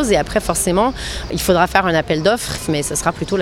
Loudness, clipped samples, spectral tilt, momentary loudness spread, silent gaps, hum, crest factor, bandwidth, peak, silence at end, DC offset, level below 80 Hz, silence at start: -17 LUFS; under 0.1%; -4 dB/octave; 6 LU; none; none; 18 dB; 17 kHz; 0 dBFS; 0 s; under 0.1%; -32 dBFS; 0 s